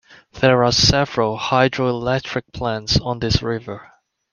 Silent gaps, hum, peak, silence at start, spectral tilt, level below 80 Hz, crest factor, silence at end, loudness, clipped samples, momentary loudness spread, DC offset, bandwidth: none; none; -2 dBFS; 0.35 s; -4.5 dB/octave; -38 dBFS; 18 dB; 0.5 s; -18 LUFS; under 0.1%; 12 LU; under 0.1%; 10 kHz